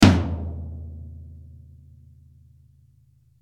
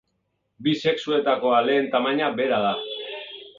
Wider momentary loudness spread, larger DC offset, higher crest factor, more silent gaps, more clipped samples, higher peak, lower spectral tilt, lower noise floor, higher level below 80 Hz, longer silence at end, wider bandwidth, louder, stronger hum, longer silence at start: first, 26 LU vs 12 LU; neither; first, 24 dB vs 18 dB; neither; neither; first, -2 dBFS vs -6 dBFS; about the same, -6 dB/octave vs -5.5 dB/octave; second, -58 dBFS vs -74 dBFS; first, -42 dBFS vs -68 dBFS; first, 2.05 s vs 0.1 s; first, 14 kHz vs 7.6 kHz; second, -26 LUFS vs -23 LUFS; neither; second, 0 s vs 0.6 s